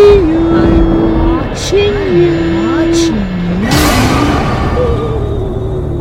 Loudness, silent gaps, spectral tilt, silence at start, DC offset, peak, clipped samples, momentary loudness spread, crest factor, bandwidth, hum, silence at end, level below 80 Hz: -11 LUFS; none; -6 dB/octave; 0 s; under 0.1%; 0 dBFS; 1%; 7 LU; 10 dB; 16.5 kHz; none; 0 s; -20 dBFS